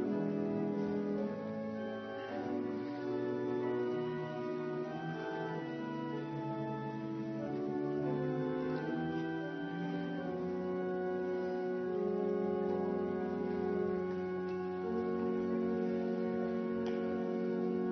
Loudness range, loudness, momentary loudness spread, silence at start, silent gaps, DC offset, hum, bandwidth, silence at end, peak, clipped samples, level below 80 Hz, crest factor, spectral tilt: 3 LU; -37 LUFS; 5 LU; 0 s; none; under 0.1%; none; 6.2 kHz; 0 s; -24 dBFS; under 0.1%; -74 dBFS; 12 dB; -7 dB/octave